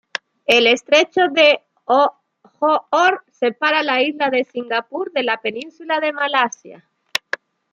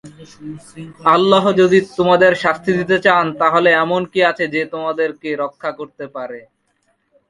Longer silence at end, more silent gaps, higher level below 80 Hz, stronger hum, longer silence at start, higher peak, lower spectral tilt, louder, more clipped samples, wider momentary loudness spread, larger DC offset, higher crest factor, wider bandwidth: about the same, 0.95 s vs 0.9 s; neither; second, -72 dBFS vs -56 dBFS; neither; first, 0.5 s vs 0.05 s; about the same, 0 dBFS vs 0 dBFS; second, -2 dB/octave vs -6 dB/octave; about the same, -17 LUFS vs -15 LUFS; neither; second, 12 LU vs 20 LU; neither; about the same, 18 dB vs 16 dB; first, 15 kHz vs 11.5 kHz